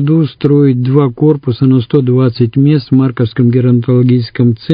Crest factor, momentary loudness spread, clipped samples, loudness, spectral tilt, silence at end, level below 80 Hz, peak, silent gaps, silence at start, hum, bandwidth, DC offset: 10 dB; 3 LU; 0.2%; -11 LUFS; -11.5 dB/octave; 0 s; -46 dBFS; 0 dBFS; none; 0 s; none; 5.2 kHz; under 0.1%